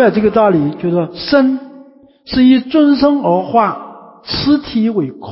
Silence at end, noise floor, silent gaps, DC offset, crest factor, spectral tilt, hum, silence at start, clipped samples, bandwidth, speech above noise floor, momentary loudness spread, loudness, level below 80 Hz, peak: 0 s; -42 dBFS; none; under 0.1%; 12 dB; -10.5 dB/octave; none; 0 s; under 0.1%; 5.8 kHz; 29 dB; 9 LU; -13 LUFS; -42 dBFS; 0 dBFS